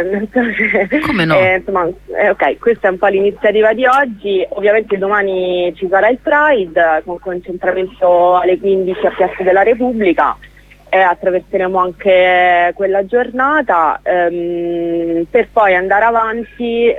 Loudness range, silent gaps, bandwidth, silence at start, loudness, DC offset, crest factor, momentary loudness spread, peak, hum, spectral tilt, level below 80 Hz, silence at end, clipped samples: 1 LU; none; 9.8 kHz; 0 s; -13 LUFS; under 0.1%; 12 dB; 7 LU; 0 dBFS; 50 Hz at -45 dBFS; -7 dB/octave; -44 dBFS; 0 s; under 0.1%